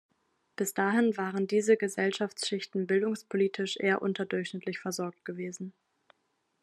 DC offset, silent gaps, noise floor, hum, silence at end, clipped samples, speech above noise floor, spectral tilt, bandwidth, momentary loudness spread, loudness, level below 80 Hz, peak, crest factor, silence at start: under 0.1%; none; -77 dBFS; none; 0.9 s; under 0.1%; 47 dB; -4.5 dB/octave; 13 kHz; 12 LU; -30 LUFS; -84 dBFS; -12 dBFS; 18 dB; 0.6 s